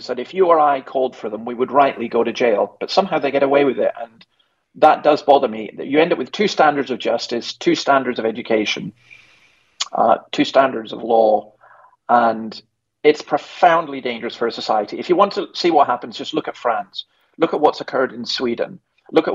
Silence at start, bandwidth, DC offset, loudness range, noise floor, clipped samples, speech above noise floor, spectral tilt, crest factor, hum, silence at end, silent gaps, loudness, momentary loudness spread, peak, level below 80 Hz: 0 s; 7.8 kHz; under 0.1%; 3 LU; -55 dBFS; under 0.1%; 37 dB; -4.5 dB/octave; 18 dB; none; 0 s; none; -18 LUFS; 10 LU; 0 dBFS; -66 dBFS